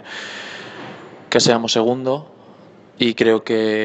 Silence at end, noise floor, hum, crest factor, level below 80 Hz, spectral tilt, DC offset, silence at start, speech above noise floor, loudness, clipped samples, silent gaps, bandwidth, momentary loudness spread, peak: 0 s; -45 dBFS; none; 20 dB; -62 dBFS; -4 dB/octave; under 0.1%; 0 s; 28 dB; -18 LUFS; under 0.1%; none; 8.6 kHz; 19 LU; 0 dBFS